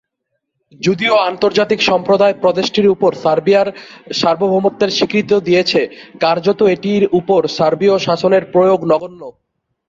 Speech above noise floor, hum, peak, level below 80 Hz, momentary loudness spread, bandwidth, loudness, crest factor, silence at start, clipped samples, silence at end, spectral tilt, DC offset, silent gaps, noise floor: 59 dB; none; -2 dBFS; -56 dBFS; 5 LU; 7.6 kHz; -14 LUFS; 12 dB; 0.8 s; under 0.1%; 0.6 s; -5.5 dB/octave; under 0.1%; none; -73 dBFS